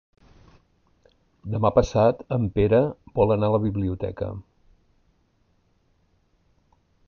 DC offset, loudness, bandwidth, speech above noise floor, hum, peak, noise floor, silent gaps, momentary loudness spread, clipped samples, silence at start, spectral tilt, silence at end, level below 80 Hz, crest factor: under 0.1%; -23 LUFS; 7 kHz; 44 dB; none; -4 dBFS; -66 dBFS; none; 13 LU; under 0.1%; 1.45 s; -8.5 dB/octave; 2.65 s; -44 dBFS; 20 dB